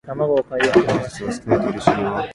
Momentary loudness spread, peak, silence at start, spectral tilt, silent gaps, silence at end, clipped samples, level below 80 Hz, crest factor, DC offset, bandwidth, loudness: 7 LU; 0 dBFS; 0.05 s; -6 dB/octave; none; 0 s; under 0.1%; -48 dBFS; 18 dB; under 0.1%; 11.5 kHz; -19 LUFS